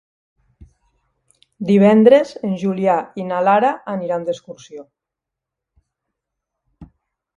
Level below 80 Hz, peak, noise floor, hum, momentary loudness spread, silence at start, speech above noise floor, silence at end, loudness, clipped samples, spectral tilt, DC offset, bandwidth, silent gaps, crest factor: -58 dBFS; 0 dBFS; -84 dBFS; none; 22 LU; 1.6 s; 68 dB; 0.5 s; -16 LUFS; under 0.1%; -7.5 dB/octave; under 0.1%; 7.6 kHz; none; 20 dB